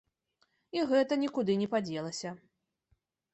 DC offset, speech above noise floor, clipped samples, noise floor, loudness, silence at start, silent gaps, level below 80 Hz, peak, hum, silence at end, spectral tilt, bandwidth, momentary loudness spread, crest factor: under 0.1%; 45 dB; under 0.1%; -76 dBFS; -32 LUFS; 0.75 s; none; -76 dBFS; -16 dBFS; none; 0.95 s; -5.5 dB/octave; 8.4 kHz; 12 LU; 18 dB